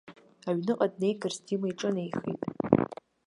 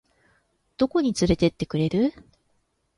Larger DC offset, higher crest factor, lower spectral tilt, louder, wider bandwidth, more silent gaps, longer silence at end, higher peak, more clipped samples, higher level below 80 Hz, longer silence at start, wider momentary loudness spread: neither; first, 26 dB vs 18 dB; about the same, -6.5 dB/octave vs -6.5 dB/octave; second, -30 LUFS vs -24 LUFS; about the same, 11 kHz vs 11.5 kHz; neither; second, 0.3 s vs 0.85 s; first, -4 dBFS vs -8 dBFS; neither; second, -66 dBFS vs -46 dBFS; second, 0.05 s vs 0.8 s; first, 8 LU vs 5 LU